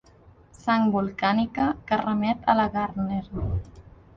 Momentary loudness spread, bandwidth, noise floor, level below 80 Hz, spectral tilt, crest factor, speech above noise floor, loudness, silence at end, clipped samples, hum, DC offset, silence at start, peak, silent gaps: 8 LU; 7.4 kHz; -53 dBFS; -42 dBFS; -7.5 dB/octave; 18 dB; 29 dB; -25 LUFS; 0.3 s; under 0.1%; none; under 0.1%; 0.65 s; -8 dBFS; none